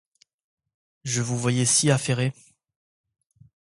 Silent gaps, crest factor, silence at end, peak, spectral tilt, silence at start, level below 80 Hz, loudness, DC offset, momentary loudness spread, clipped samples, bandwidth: none; 20 dB; 1.35 s; -6 dBFS; -4 dB/octave; 1.05 s; -62 dBFS; -23 LUFS; under 0.1%; 10 LU; under 0.1%; 11.5 kHz